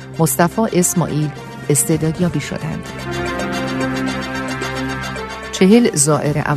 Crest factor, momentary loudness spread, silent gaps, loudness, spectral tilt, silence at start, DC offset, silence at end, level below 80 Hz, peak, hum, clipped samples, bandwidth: 18 dB; 13 LU; none; -17 LUFS; -4.5 dB/octave; 0 s; under 0.1%; 0 s; -42 dBFS; 0 dBFS; none; under 0.1%; 14 kHz